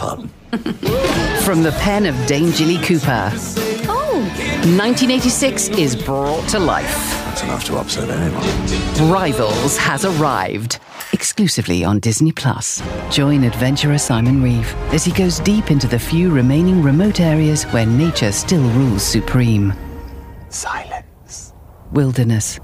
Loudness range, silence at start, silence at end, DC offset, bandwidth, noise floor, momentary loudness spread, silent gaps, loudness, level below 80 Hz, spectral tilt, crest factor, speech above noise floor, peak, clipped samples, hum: 4 LU; 0 s; 0 s; under 0.1%; 16 kHz; -38 dBFS; 9 LU; none; -16 LUFS; -32 dBFS; -5 dB/octave; 14 dB; 22 dB; -4 dBFS; under 0.1%; none